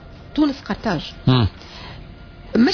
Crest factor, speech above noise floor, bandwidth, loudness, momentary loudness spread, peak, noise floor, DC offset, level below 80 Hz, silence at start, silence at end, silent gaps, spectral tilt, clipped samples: 16 dB; 20 dB; 5.4 kHz; -21 LUFS; 21 LU; -4 dBFS; -39 dBFS; under 0.1%; -40 dBFS; 0 s; 0 s; none; -7.5 dB/octave; under 0.1%